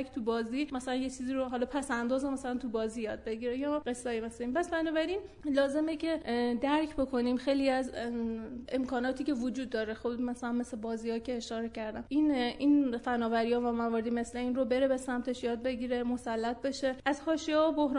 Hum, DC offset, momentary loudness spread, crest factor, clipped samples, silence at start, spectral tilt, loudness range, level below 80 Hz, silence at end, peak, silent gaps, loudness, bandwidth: none; under 0.1%; 7 LU; 16 dB; under 0.1%; 0 s; -4.5 dB/octave; 4 LU; -58 dBFS; 0 s; -16 dBFS; none; -33 LUFS; 11 kHz